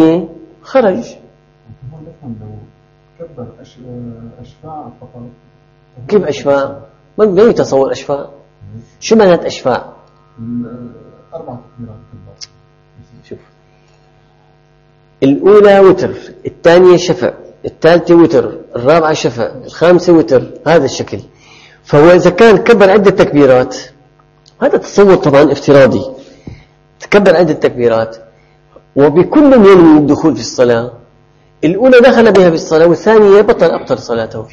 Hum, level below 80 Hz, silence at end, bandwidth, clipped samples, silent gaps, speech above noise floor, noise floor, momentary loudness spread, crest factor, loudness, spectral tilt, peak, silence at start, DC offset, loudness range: none; -44 dBFS; 0.1 s; 8.2 kHz; 1%; none; 39 dB; -48 dBFS; 23 LU; 10 dB; -8 LUFS; -6.5 dB/octave; 0 dBFS; 0 s; under 0.1%; 12 LU